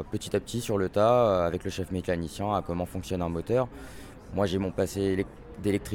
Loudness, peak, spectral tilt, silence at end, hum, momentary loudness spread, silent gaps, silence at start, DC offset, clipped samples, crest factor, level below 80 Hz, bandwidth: -29 LUFS; -12 dBFS; -6 dB/octave; 0 s; none; 11 LU; none; 0 s; under 0.1%; under 0.1%; 16 dB; -48 dBFS; 17.5 kHz